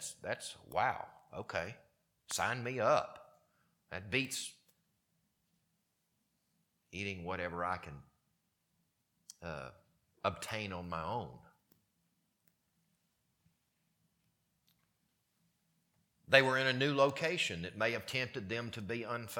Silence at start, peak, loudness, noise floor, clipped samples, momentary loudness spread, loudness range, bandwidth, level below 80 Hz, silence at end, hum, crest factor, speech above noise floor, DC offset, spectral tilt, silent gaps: 0 s; -8 dBFS; -36 LUFS; -81 dBFS; under 0.1%; 17 LU; 12 LU; 19 kHz; -70 dBFS; 0 s; none; 32 dB; 45 dB; under 0.1%; -4 dB/octave; none